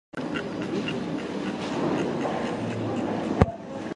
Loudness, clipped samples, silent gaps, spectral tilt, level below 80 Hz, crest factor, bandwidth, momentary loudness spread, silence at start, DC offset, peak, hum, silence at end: -28 LUFS; under 0.1%; none; -6.5 dB/octave; -42 dBFS; 28 dB; 11 kHz; 7 LU; 0.15 s; under 0.1%; 0 dBFS; none; 0 s